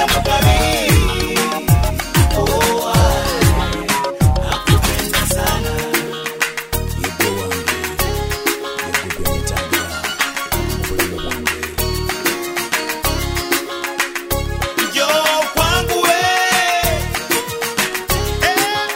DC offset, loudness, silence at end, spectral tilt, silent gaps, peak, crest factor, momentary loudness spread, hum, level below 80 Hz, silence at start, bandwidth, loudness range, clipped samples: under 0.1%; -17 LUFS; 0 s; -3.5 dB/octave; none; 0 dBFS; 16 dB; 7 LU; none; -24 dBFS; 0 s; 16.5 kHz; 4 LU; under 0.1%